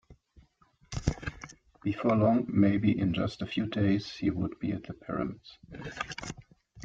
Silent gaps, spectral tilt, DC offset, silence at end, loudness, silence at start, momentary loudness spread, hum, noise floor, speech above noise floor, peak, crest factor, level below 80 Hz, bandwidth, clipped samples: none; -7 dB/octave; under 0.1%; 0 s; -30 LUFS; 0.1 s; 18 LU; none; -65 dBFS; 36 dB; -10 dBFS; 22 dB; -50 dBFS; 7.8 kHz; under 0.1%